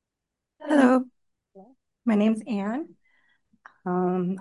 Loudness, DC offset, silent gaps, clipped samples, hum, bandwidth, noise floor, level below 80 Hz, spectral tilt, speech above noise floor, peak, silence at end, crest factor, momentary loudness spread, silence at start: -24 LUFS; under 0.1%; none; under 0.1%; none; 11.5 kHz; -85 dBFS; -76 dBFS; -7.5 dB/octave; 63 dB; -8 dBFS; 0 s; 20 dB; 19 LU; 0.6 s